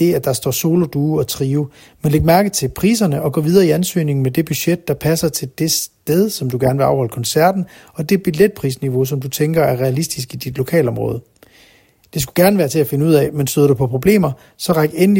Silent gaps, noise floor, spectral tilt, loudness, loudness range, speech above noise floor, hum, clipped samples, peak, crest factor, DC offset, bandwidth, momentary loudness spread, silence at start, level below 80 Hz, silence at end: none; -51 dBFS; -5.5 dB/octave; -16 LUFS; 3 LU; 35 dB; none; under 0.1%; 0 dBFS; 16 dB; under 0.1%; 16.5 kHz; 9 LU; 0 s; -42 dBFS; 0 s